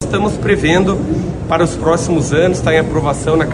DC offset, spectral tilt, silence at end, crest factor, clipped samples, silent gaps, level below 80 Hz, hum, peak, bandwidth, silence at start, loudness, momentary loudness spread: under 0.1%; -6 dB/octave; 0 s; 14 dB; under 0.1%; none; -30 dBFS; none; 0 dBFS; 11.5 kHz; 0 s; -14 LUFS; 5 LU